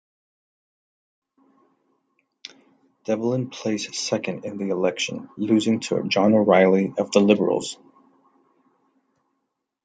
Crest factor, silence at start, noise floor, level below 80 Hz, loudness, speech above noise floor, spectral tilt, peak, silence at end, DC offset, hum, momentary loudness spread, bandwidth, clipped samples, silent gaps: 22 dB; 3.1 s; -78 dBFS; -70 dBFS; -22 LUFS; 57 dB; -5 dB/octave; -2 dBFS; 2.1 s; under 0.1%; none; 19 LU; 9.4 kHz; under 0.1%; none